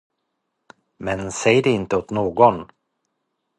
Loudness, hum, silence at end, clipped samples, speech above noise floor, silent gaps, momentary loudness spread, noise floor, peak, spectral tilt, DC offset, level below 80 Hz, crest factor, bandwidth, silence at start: -19 LUFS; none; 0.95 s; under 0.1%; 57 dB; none; 12 LU; -76 dBFS; 0 dBFS; -5 dB/octave; under 0.1%; -52 dBFS; 20 dB; 11.5 kHz; 1 s